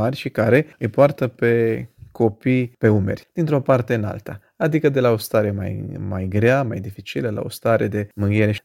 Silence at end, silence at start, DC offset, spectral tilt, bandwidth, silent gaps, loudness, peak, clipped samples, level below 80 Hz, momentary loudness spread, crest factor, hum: 0.05 s; 0 s; under 0.1%; -7.5 dB/octave; 16.5 kHz; none; -20 LUFS; 0 dBFS; under 0.1%; -54 dBFS; 11 LU; 18 dB; none